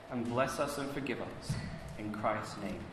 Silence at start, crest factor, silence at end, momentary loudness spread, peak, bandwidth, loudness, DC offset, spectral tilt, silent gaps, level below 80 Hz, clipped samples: 0 s; 20 dB; 0 s; 8 LU; -18 dBFS; 14 kHz; -37 LUFS; under 0.1%; -5.5 dB/octave; none; -56 dBFS; under 0.1%